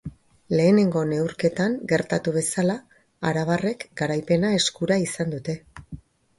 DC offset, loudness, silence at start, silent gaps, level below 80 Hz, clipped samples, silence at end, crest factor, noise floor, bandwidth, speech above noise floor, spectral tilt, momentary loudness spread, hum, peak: under 0.1%; -23 LUFS; 0.05 s; none; -56 dBFS; under 0.1%; 0.4 s; 18 dB; -43 dBFS; 11.5 kHz; 20 dB; -5 dB/octave; 14 LU; none; -6 dBFS